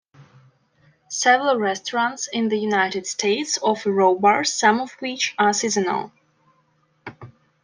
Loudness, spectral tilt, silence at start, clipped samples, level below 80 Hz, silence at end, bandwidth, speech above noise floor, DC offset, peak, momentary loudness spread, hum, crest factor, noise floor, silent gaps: -20 LUFS; -2.5 dB/octave; 0.2 s; under 0.1%; -72 dBFS; 0.35 s; 10.5 kHz; 43 dB; under 0.1%; -2 dBFS; 12 LU; none; 20 dB; -64 dBFS; none